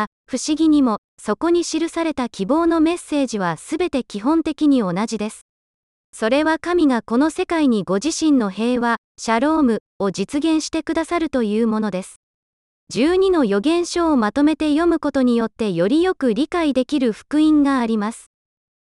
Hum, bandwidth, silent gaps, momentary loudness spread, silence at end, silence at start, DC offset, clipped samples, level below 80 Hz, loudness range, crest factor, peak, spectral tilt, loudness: none; 11.5 kHz; 0.07-0.24 s, 0.98-1.18 s, 5.42-6.13 s, 8.98-9.15 s, 9.80-10.00 s, 12.16-12.87 s; 7 LU; 0.6 s; 0 s; under 0.1%; under 0.1%; -50 dBFS; 3 LU; 14 dB; -4 dBFS; -5 dB/octave; -19 LUFS